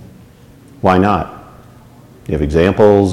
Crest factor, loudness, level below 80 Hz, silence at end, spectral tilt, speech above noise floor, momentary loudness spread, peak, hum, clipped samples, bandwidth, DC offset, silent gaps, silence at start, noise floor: 14 dB; -13 LUFS; -32 dBFS; 0 s; -7.5 dB/octave; 30 dB; 15 LU; 0 dBFS; none; under 0.1%; 12.5 kHz; under 0.1%; none; 0.85 s; -41 dBFS